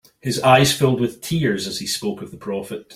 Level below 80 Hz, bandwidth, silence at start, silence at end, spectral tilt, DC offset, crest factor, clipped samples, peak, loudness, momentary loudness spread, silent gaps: -52 dBFS; 16 kHz; 0.25 s; 0 s; -4.5 dB/octave; under 0.1%; 20 dB; under 0.1%; 0 dBFS; -19 LUFS; 14 LU; none